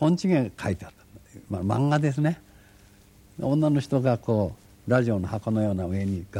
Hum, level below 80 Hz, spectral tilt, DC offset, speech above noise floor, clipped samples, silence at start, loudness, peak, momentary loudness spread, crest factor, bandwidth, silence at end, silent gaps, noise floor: none; -54 dBFS; -8 dB/octave; under 0.1%; 30 dB; under 0.1%; 0 s; -26 LUFS; -8 dBFS; 10 LU; 18 dB; 13 kHz; 0 s; none; -54 dBFS